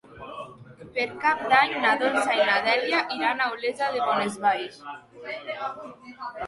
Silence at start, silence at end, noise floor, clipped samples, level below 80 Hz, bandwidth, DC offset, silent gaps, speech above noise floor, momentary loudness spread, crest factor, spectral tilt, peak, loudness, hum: 0.1 s; 0 s; -46 dBFS; under 0.1%; -66 dBFS; 11.5 kHz; under 0.1%; none; 20 dB; 20 LU; 20 dB; -3 dB/octave; -6 dBFS; -24 LUFS; none